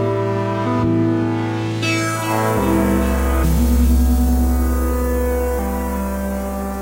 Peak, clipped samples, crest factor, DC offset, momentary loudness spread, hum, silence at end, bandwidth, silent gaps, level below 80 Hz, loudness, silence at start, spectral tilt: -4 dBFS; under 0.1%; 12 dB; under 0.1%; 6 LU; none; 0 s; 16 kHz; none; -20 dBFS; -18 LUFS; 0 s; -6.5 dB/octave